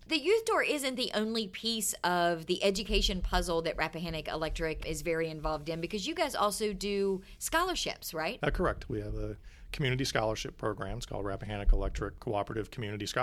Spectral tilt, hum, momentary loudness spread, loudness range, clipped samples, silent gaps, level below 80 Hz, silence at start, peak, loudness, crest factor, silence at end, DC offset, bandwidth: -4 dB/octave; none; 9 LU; 4 LU; under 0.1%; none; -40 dBFS; 0 s; -12 dBFS; -33 LUFS; 20 dB; 0 s; under 0.1%; 15.5 kHz